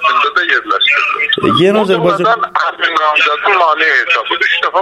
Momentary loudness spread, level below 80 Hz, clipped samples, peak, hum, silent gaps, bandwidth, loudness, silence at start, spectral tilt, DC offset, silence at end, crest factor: 3 LU; -54 dBFS; under 0.1%; 0 dBFS; none; none; 12.5 kHz; -11 LUFS; 0 s; -4.5 dB/octave; under 0.1%; 0 s; 12 dB